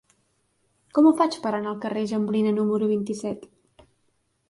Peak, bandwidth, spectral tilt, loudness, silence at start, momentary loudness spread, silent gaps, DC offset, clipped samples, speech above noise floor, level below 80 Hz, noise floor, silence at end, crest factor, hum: -8 dBFS; 11.5 kHz; -6.5 dB/octave; -24 LUFS; 0.95 s; 12 LU; none; under 0.1%; under 0.1%; 47 dB; -70 dBFS; -70 dBFS; 1.05 s; 18 dB; none